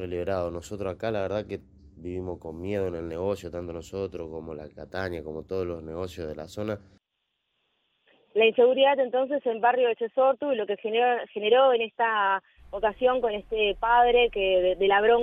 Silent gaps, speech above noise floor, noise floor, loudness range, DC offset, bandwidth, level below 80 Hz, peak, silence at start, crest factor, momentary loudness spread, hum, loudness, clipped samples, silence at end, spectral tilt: none; 54 dB; -80 dBFS; 12 LU; under 0.1%; 8.4 kHz; -52 dBFS; -10 dBFS; 0 s; 16 dB; 16 LU; none; -26 LUFS; under 0.1%; 0 s; -5.5 dB/octave